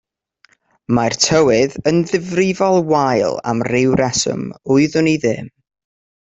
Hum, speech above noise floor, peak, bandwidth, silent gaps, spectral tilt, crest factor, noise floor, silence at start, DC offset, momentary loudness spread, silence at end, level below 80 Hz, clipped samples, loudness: none; 41 dB; -2 dBFS; 8.2 kHz; none; -4.5 dB/octave; 16 dB; -57 dBFS; 0.9 s; under 0.1%; 7 LU; 0.85 s; -50 dBFS; under 0.1%; -16 LUFS